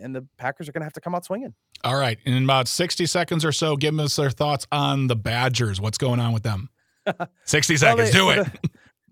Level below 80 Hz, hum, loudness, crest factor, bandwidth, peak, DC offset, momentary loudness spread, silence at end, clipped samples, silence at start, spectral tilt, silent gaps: -58 dBFS; none; -22 LUFS; 22 dB; 16.5 kHz; 0 dBFS; under 0.1%; 15 LU; 0.4 s; under 0.1%; 0 s; -4 dB/octave; none